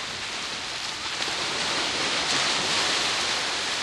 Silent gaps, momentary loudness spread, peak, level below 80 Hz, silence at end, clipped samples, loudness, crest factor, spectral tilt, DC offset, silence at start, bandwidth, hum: none; 7 LU; -8 dBFS; -58 dBFS; 0 s; under 0.1%; -24 LUFS; 20 dB; -0.5 dB/octave; under 0.1%; 0 s; 13 kHz; none